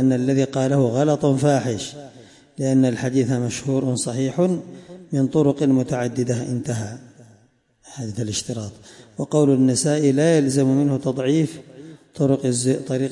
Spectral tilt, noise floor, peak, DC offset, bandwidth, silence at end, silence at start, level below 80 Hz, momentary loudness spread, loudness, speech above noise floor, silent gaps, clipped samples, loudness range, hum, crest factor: -6 dB/octave; -59 dBFS; -6 dBFS; under 0.1%; 11.5 kHz; 0 s; 0 s; -60 dBFS; 15 LU; -20 LUFS; 39 dB; none; under 0.1%; 5 LU; none; 14 dB